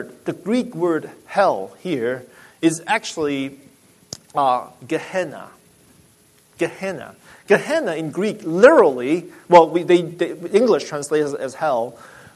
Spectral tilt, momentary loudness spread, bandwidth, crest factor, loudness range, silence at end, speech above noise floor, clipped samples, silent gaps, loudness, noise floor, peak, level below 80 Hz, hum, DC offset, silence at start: -5 dB/octave; 16 LU; 13.5 kHz; 20 dB; 10 LU; 0.3 s; 35 dB; under 0.1%; none; -19 LUFS; -54 dBFS; 0 dBFS; -64 dBFS; none; under 0.1%; 0 s